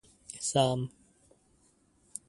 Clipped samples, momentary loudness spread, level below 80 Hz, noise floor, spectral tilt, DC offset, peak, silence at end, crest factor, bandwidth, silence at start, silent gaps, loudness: under 0.1%; 18 LU; -68 dBFS; -67 dBFS; -4.5 dB/octave; under 0.1%; -12 dBFS; 1.4 s; 24 dB; 11.5 kHz; 0.3 s; none; -31 LUFS